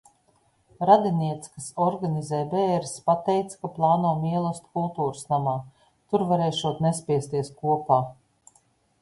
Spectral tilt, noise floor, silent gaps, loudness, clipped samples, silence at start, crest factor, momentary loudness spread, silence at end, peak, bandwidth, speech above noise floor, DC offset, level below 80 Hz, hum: -6.5 dB/octave; -65 dBFS; none; -25 LUFS; under 0.1%; 0.8 s; 22 dB; 9 LU; 0.9 s; -4 dBFS; 11.5 kHz; 41 dB; under 0.1%; -64 dBFS; none